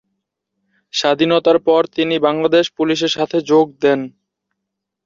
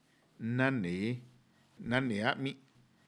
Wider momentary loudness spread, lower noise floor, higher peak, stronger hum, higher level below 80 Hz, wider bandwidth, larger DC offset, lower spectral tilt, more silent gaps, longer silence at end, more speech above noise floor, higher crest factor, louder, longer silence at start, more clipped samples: second, 5 LU vs 12 LU; first, -79 dBFS vs -65 dBFS; first, -2 dBFS vs -14 dBFS; neither; first, -62 dBFS vs -68 dBFS; second, 7.6 kHz vs 11 kHz; neither; second, -4.5 dB/octave vs -6.5 dB/octave; neither; first, 0.95 s vs 0.5 s; first, 64 dB vs 32 dB; second, 14 dB vs 22 dB; first, -16 LUFS vs -34 LUFS; first, 0.95 s vs 0.4 s; neither